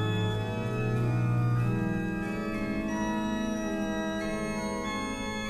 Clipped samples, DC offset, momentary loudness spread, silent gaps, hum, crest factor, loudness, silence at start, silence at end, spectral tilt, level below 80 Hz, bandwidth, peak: under 0.1%; under 0.1%; 5 LU; none; none; 12 dB; -31 LUFS; 0 s; 0 s; -6.5 dB/octave; -46 dBFS; 13.5 kHz; -18 dBFS